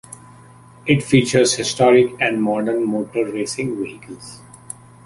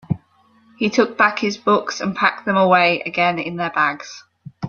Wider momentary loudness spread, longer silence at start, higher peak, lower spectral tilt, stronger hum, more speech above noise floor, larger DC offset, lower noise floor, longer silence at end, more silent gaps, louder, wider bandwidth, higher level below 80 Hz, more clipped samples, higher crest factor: first, 22 LU vs 13 LU; about the same, 0.1 s vs 0.1 s; about the same, 0 dBFS vs -2 dBFS; about the same, -4.5 dB/octave vs -5 dB/octave; neither; second, 27 dB vs 37 dB; neither; second, -45 dBFS vs -56 dBFS; first, 0.7 s vs 0 s; neither; about the same, -18 LUFS vs -18 LUFS; first, 11.5 kHz vs 7.4 kHz; first, -54 dBFS vs -60 dBFS; neither; about the same, 18 dB vs 18 dB